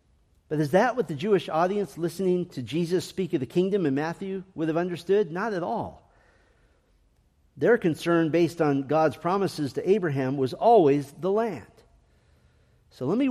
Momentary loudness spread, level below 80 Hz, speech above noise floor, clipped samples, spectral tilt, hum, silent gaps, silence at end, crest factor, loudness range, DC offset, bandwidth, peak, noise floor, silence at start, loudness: 9 LU; -64 dBFS; 39 dB; under 0.1%; -7 dB/octave; none; none; 0 s; 18 dB; 5 LU; under 0.1%; 14.5 kHz; -8 dBFS; -64 dBFS; 0.5 s; -25 LUFS